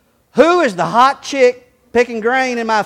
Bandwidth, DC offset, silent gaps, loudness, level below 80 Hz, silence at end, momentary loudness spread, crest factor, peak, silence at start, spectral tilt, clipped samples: 12 kHz; under 0.1%; none; -14 LUFS; -54 dBFS; 0 s; 6 LU; 14 dB; 0 dBFS; 0.35 s; -4 dB/octave; 0.1%